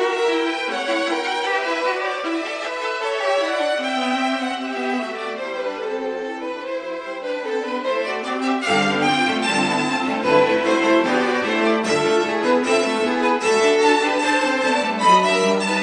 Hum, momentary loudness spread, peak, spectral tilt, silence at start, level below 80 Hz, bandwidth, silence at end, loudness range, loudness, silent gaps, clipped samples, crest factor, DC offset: none; 10 LU; -2 dBFS; -3.5 dB/octave; 0 s; -66 dBFS; 10 kHz; 0 s; 7 LU; -20 LUFS; none; under 0.1%; 18 dB; under 0.1%